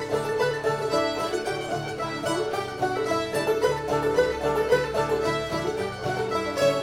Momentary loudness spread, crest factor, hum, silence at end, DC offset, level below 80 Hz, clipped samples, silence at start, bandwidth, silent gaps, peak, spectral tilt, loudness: 6 LU; 16 dB; none; 0 s; under 0.1%; -50 dBFS; under 0.1%; 0 s; 16.5 kHz; none; -10 dBFS; -4.5 dB/octave; -26 LUFS